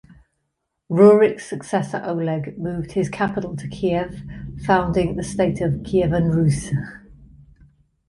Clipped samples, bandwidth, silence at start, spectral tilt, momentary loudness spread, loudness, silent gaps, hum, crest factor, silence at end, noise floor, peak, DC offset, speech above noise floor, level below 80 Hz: under 0.1%; 11.5 kHz; 0.1 s; -7 dB/octave; 15 LU; -20 LUFS; none; none; 18 dB; 0.85 s; -76 dBFS; -2 dBFS; under 0.1%; 56 dB; -42 dBFS